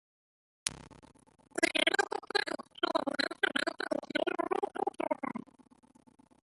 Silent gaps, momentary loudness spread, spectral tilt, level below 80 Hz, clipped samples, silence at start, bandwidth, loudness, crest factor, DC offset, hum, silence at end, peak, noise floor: none; 10 LU; -2 dB/octave; -72 dBFS; under 0.1%; 0.65 s; 11.5 kHz; -33 LUFS; 30 dB; under 0.1%; none; 1 s; -4 dBFS; -62 dBFS